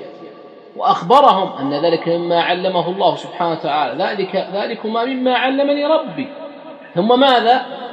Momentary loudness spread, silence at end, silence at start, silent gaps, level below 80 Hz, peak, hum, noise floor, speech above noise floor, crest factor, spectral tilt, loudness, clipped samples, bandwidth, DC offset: 15 LU; 0 s; 0 s; none; -70 dBFS; 0 dBFS; none; -38 dBFS; 23 dB; 16 dB; -6 dB/octave; -16 LUFS; under 0.1%; 9 kHz; under 0.1%